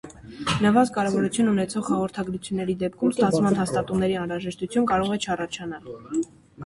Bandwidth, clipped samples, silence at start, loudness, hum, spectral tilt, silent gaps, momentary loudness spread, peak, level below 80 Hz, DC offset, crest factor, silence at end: 11.5 kHz; under 0.1%; 0.05 s; -24 LUFS; none; -5.5 dB/octave; none; 11 LU; -6 dBFS; -52 dBFS; under 0.1%; 18 dB; 0 s